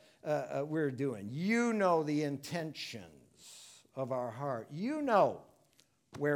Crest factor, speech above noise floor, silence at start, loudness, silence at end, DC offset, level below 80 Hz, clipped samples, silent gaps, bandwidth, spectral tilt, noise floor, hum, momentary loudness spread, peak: 20 dB; 37 dB; 0.25 s; -34 LUFS; 0 s; under 0.1%; -80 dBFS; under 0.1%; none; 17.5 kHz; -6 dB/octave; -70 dBFS; none; 20 LU; -14 dBFS